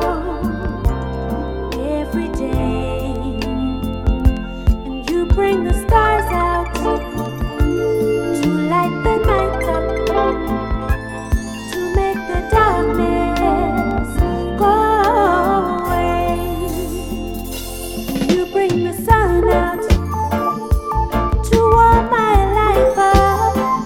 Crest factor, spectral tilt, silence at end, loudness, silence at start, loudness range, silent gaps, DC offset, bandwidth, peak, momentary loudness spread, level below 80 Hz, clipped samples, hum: 16 dB; -6.5 dB/octave; 0 s; -17 LUFS; 0 s; 5 LU; none; under 0.1%; 17.5 kHz; 0 dBFS; 10 LU; -22 dBFS; under 0.1%; none